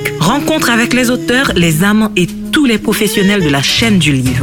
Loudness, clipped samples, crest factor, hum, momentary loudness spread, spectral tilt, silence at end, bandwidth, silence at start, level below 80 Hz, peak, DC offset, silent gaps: -11 LUFS; under 0.1%; 10 dB; none; 3 LU; -4.5 dB/octave; 0 s; 19 kHz; 0 s; -34 dBFS; 0 dBFS; under 0.1%; none